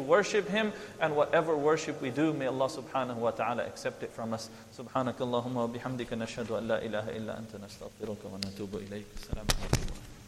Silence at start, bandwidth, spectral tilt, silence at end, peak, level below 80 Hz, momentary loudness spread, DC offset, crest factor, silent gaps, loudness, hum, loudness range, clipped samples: 0 s; 15.5 kHz; -5 dB/octave; 0 s; -4 dBFS; -46 dBFS; 15 LU; under 0.1%; 28 dB; none; -33 LUFS; none; 7 LU; under 0.1%